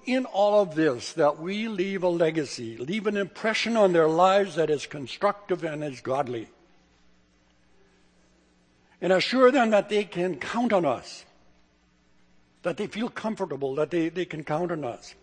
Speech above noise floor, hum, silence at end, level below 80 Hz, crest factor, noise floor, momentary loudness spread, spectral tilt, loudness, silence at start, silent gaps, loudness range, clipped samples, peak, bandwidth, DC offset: 38 dB; none; 0.1 s; -68 dBFS; 20 dB; -63 dBFS; 13 LU; -5.5 dB/octave; -25 LUFS; 0.05 s; none; 8 LU; under 0.1%; -6 dBFS; 9.8 kHz; under 0.1%